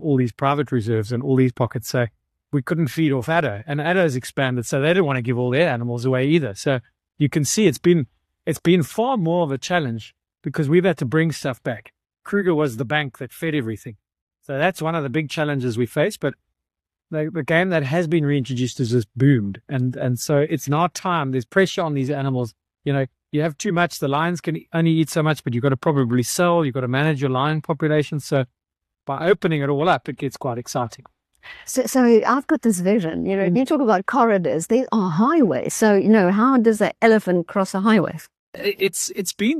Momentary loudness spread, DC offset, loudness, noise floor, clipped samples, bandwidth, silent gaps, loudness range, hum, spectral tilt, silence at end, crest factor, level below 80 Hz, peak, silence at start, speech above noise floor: 10 LU; under 0.1%; -20 LUFS; -86 dBFS; under 0.1%; 13 kHz; 14.21-14.27 s, 38.39-38.53 s; 6 LU; none; -6 dB/octave; 0 s; 16 dB; -60 dBFS; -4 dBFS; 0 s; 66 dB